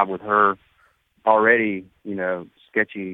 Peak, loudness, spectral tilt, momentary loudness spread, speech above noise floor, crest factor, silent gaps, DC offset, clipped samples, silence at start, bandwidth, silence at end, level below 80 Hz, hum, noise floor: -2 dBFS; -20 LUFS; -8.5 dB/octave; 15 LU; 41 dB; 20 dB; none; under 0.1%; under 0.1%; 0 s; 4 kHz; 0 s; -66 dBFS; none; -62 dBFS